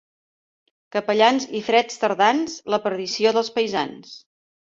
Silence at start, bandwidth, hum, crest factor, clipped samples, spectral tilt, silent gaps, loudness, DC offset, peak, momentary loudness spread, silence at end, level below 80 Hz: 0.95 s; 7.8 kHz; none; 20 dB; under 0.1%; -3.5 dB/octave; none; -21 LUFS; under 0.1%; -2 dBFS; 9 LU; 0.5 s; -68 dBFS